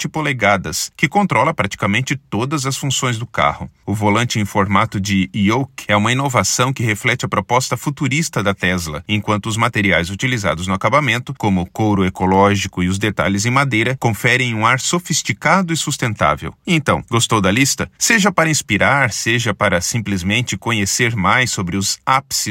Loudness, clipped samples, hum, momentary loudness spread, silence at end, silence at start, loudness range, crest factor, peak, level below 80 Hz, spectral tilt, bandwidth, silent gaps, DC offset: -16 LUFS; under 0.1%; none; 5 LU; 0 s; 0 s; 3 LU; 16 dB; 0 dBFS; -48 dBFS; -4 dB/octave; 16.5 kHz; none; under 0.1%